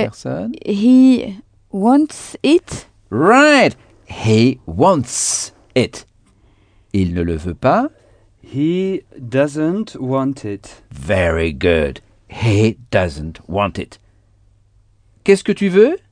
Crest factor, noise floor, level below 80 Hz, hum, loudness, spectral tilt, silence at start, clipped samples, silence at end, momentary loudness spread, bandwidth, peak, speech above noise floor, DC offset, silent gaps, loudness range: 16 dB; -53 dBFS; -40 dBFS; none; -16 LUFS; -5.5 dB/octave; 0 s; under 0.1%; 0.15 s; 17 LU; 10 kHz; 0 dBFS; 38 dB; under 0.1%; none; 6 LU